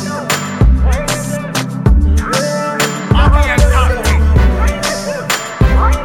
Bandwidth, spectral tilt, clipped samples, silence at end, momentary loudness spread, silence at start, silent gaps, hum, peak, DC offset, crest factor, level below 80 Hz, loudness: 17 kHz; -5 dB/octave; under 0.1%; 0 s; 6 LU; 0 s; none; none; 0 dBFS; under 0.1%; 12 dB; -14 dBFS; -13 LUFS